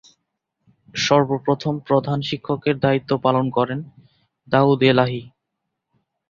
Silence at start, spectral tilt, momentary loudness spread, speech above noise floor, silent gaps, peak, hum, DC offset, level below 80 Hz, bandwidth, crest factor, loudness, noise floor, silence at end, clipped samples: 0.95 s; -6 dB/octave; 9 LU; 60 dB; none; -2 dBFS; none; under 0.1%; -58 dBFS; 7.4 kHz; 20 dB; -20 LUFS; -79 dBFS; 1 s; under 0.1%